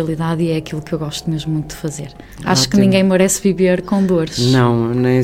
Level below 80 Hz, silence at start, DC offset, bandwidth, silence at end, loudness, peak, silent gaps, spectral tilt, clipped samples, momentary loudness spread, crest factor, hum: -42 dBFS; 0 s; under 0.1%; 16 kHz; 0 s; -16 LUFS; 0 dBFS; none; -5.5 dB/octave; under 0.1%; 13 LU; 16 dB; none